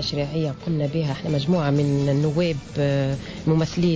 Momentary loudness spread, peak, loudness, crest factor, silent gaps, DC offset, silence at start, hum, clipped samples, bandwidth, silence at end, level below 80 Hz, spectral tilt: 5 LU; -10 dBFS; -23 LUFS; 12 dB; none; under 0.1%; 0 s; none; under 0.1%; 8 kHz; 0 s; -46 dBFS; -7 dB/octave